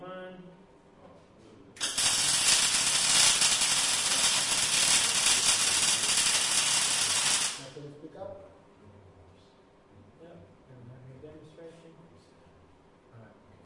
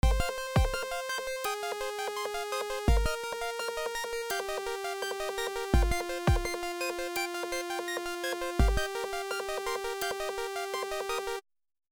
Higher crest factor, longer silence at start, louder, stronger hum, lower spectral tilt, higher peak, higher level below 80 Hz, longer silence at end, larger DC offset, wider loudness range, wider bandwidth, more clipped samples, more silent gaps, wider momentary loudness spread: about the same, 22 dB vs 20 dB; about the same, 0 s vs 0.05 s; first, -23 LUFS vs -33 LUFS; neither; second, 1 dB/octave vs -4.5 dB/octave; first, -8 dBFS vs -12 dBFS; second, -62 dBFS vs -36 dBFS; about the same, 0.4 s vs 0.5 s; neither; first, 7 LU vs 1 LU; second, 11.5 kHz vs over 20 kHz; neither; neither; first, 23 LU vs 5 LU